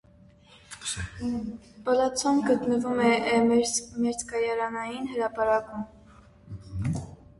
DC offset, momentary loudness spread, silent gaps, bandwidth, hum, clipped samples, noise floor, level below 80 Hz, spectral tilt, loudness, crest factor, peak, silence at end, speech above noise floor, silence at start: under 0.1%; 16 LU; none; 11.5 kHz; none; under 0.1%; -55 dBFS; -52 dBFS; -4.5 dB/octave; -27 LUFS; 18 dB; -10 dBFS; 0.25 s; 29 dB; 0.7 s